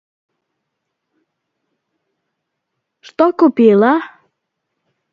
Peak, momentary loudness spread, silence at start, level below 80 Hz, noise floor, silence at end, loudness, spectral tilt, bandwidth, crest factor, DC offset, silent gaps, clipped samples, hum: 0 dBFS; 20 LU; 3.2 s; -68 dBFS; -75 dBFS; 1.05 s; -12 LUFS; -8 dB/octave; 6.8 kHz; 18 dB; under 0.1%; none; under 0.1%; none